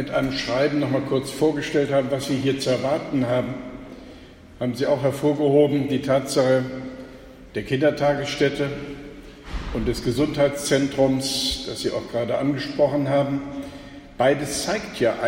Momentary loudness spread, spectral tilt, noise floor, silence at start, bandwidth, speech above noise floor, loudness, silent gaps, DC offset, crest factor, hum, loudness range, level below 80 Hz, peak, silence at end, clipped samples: 16 LU; -5 dB/octave; -44 dBFS; 0 s; 16.5 kHz; 22 dB; -22 LUFS; none; under 0.1%; 18 dB; none; 3 LU; -44 dBFS; -6 dBFS; 0 s; under 0.1%